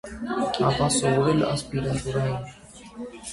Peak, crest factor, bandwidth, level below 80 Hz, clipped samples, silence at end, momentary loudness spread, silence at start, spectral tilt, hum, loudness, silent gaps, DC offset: -8 dBFS; 18 dB; 11.5 kHz; -46 dBFS; under 0.1%; 0 s; 18 LU; 0.05 s; -5 dB/octave; none; -24 LUFS; none; under 0.1%